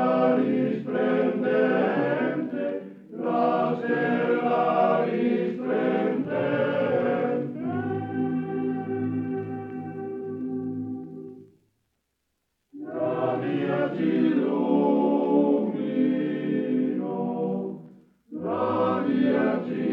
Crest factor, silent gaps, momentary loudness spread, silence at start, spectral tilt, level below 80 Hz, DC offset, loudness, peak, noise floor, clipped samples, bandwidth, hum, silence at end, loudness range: 16 dB; none; 12 LU; 0 s; -9.5 dB/octave; -74 dBFS; under 0.1%; -25 LUFS; -10 dBFS; -77 dBFS; under 0.1%; 5.4 kHz; none; 0 s; 9 LU